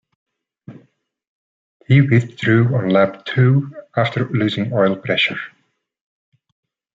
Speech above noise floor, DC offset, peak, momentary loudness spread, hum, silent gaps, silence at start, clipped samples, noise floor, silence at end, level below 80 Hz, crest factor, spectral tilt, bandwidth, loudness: 43 dB; under 0.1%; -2 dBFS; 5 LU; none; 1.28-1.80 s; 0.7 s; under 0.1%; -59 dBFS; 1.45 s; -60 dBFS; 18 dB; -8 dB/octave; 7.6 kHz; -17 LUFS